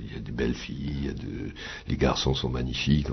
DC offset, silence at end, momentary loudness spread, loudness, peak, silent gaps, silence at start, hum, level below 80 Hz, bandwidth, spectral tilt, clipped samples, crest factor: under 0.1%; 0 s; 11 LU; -29 LUFS; -10 dBFS; none; 0 s; none; -38 dBFS; 6.4 kHz; -6 dB/octave; under 0.1%; 18 dB